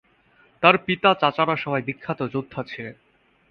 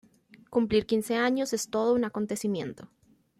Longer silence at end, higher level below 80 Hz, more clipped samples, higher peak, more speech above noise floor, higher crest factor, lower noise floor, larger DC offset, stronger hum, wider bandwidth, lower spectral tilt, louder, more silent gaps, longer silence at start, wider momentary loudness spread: about the same, 0.55 s vs 0.55 s; about the same, -62 dBFS vs -60 dBFS; neither; first, 0 dBFS vs -12 dBFS; first, 37 dB vs 28 dB; first, 24 dB vs 16 dB; first, -59 dBFS vs -55 dBFS; neither; neither; second, 6.6 kHz vs 15.5 kHz; first, -7.5 dB/octave vs -4.5 dB/octave; first, -22 LUFS vs -28 LUFS; neither; about the same, 0.6 s vs 0.5 s; first, 16 LU vs 7 LU